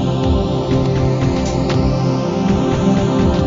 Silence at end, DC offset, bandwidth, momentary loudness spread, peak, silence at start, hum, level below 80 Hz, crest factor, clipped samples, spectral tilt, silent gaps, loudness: 0 s; under 0.1%; 7.6 kHz; 2 LU; -4 dBFS; 0 s; none; -26 dBFS; 12 dB; under 0.1%; -7.5 dB/octave; none; -16 LUFS